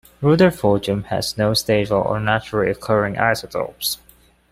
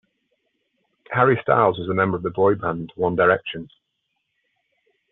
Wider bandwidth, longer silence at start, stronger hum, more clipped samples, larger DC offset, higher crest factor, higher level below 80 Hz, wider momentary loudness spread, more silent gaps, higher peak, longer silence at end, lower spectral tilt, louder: first, 16 kHz vs 4.1 kHz; second, 0.2 s vs 1.1 s; neither; neither; neither; about the same, 18 dB vs 20 dB; first, -46 dBFS vs -60 dBFS; about the same, 9 LU vs 10 LU; neither; about the same, -2 dBFS vs -2 dBFS; second, 0.55 s vs 1.45 s; about the same, -5 dB/octave vs -5 dB/octave; about the same, -19 LUFS vs -20 LUFS